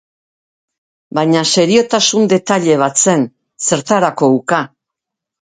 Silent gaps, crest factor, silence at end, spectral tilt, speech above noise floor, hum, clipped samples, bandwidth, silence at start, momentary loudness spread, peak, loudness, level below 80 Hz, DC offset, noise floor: none; 14 dB; 0.85 s; -3.5 dB/octave; 69 dB; none; under 0.1%; 9.6 kHz; 1.15 s; 7 LU; 0 dBFS; -13 LUFS; -60 dBFS; under 0.1%; -81 dBFS